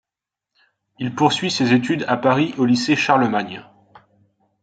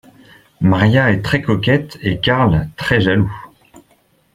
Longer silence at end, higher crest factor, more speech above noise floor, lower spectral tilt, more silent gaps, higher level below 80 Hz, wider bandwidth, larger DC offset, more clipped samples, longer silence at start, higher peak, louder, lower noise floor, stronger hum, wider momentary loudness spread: first, 1 s vs 0.85 s; about the same, 18 dB vs 16 dB; first, 68 dB vs 42 dB; second, -5 dB/octave vs -7 dB/octave; neither; second, -64 dBFS vs -38 dBFS; second, 9.2 kHz vs 13 kHz; neither; neither; first, 1 s vs 0.6 s; about the same, -2 dBFS vs 0 dBFS; second, -18 LUFS vs -15 LUFS; first, -86 dBFS vs -56 dBFS; neither; first, 12 LU vs 6 LU